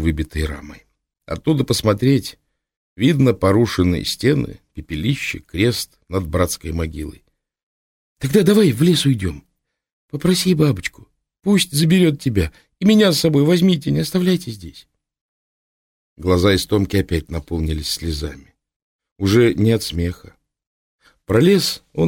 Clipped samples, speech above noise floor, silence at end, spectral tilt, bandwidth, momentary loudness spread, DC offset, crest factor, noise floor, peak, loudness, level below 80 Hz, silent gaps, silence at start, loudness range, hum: under 0.1%; over 73 dB; 0 s; -5.5 dB/octave; 17 kHz; 13 LU; under 0.1%; 16 dB; under -90 dBFS; -2 dBFS; -18 LUFS; -36 dBFS; 2.77-2.96 s, 7.63-8.16 s, 9.92-10.08 s, 15.21-16.16 s, 18.76-18.99 s, 19.12-19.16 s, 20.67-20.99 s; 0 s; 5 LU; none